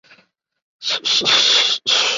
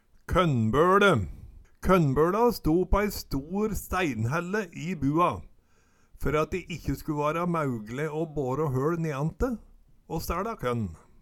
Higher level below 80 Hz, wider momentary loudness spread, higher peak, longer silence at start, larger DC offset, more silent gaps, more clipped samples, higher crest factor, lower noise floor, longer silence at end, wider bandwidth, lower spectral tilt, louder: second, -68 dBFS vs -40 dBFS; about the same, 10 LU vs 11 LU; first, -2 dBFS vs -6 dBFS; first, 0.8 s vs 0.3 s; neither; neither; neither; about the same, 16 dB vs 20 dB; second, -55 dBFS vs -62 dBFS; second, 0 s vs 0.25 s; second, 7.8 kHz vs 19 kHz; second, 1 dB/octave vs -6.5 dB/octave; first, -14 LUFS vs -27 LUFS